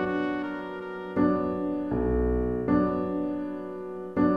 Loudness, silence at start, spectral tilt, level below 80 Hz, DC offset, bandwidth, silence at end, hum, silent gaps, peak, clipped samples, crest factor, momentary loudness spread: -28 LUFS; 0 s; -9.5 dB/octave; -40 dBFS; 0.2%; 5 kHz; 0 s; none; none; -12 dBFS; under 0.1%; 16 dB; 11 LU